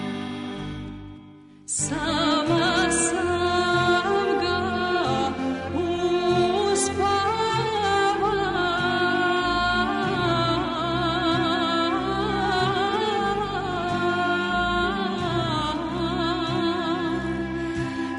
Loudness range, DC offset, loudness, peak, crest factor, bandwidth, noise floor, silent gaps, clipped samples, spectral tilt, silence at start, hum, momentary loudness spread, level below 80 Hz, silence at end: 3 LU; under 0.1%; -23 LUFS; -10 dBFS; 14 dB; 11 kHz; -47 dBFS; none; under 0.1%; -4 dB/octave; 0 s; none; 7 LU; -44 dBFS; 0 s